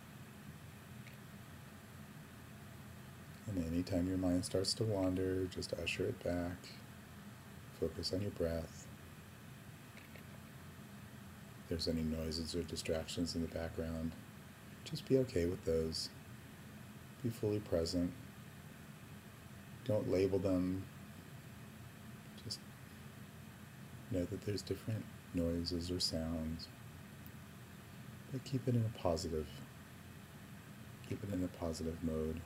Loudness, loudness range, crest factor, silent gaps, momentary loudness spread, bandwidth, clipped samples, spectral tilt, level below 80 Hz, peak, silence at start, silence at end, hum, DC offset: -40 LUFS; 8 LU; 22 dB; none; 18 LU; 16 kHz; under 0.1%; -5.5 dB/octave; -58 dBFS; -20 dBFS; 0 s; 0 s; none; under 0.1%